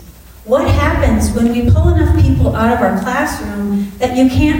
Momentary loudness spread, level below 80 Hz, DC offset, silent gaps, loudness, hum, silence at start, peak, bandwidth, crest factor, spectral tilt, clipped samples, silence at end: 6 LU; -22 dBFS; under 0.1%; none; -13 LUFS; none; 0 s; -2 dBFS; 16.5 kHz; 10 dB; -7 dB/octave; under 0.1%; 0 s